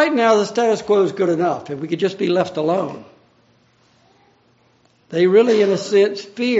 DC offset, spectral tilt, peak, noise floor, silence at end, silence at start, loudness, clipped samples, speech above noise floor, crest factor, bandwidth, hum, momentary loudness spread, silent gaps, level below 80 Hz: under 0.1%; -4.5 dB/octave; -2 dBFS; -57 dBFS; 0 s; 0 s; -18 LUFS; under 0.1%; 40 dB; 16 dB; 8 kHz; none; 11 LU; none; -68 dBFS